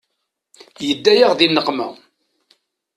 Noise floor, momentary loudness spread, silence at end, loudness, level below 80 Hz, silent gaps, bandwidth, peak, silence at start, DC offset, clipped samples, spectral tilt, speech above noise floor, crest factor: -75 dBFS; 14 LU; 1.05 s; -15 LUFS; -64 dBFS; none; 13 kHz; 0 dBFS; 0.8 s; under 0.1%; under 0.1%; -4 dB/octave; 60 dB; 20 dB